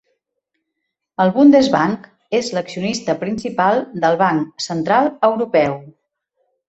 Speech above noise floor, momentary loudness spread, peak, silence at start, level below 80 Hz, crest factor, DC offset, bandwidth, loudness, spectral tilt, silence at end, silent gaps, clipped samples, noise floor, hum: 61 dB; 11 LU; -2 dBFS; 1.2 s; -58 dBFS; 16 dB; under 0.1%; 8.2 kHz; -17 LUFS; -5.5 dB/octave; 0.8 s; none; under 0.1%; -77 dBFS; none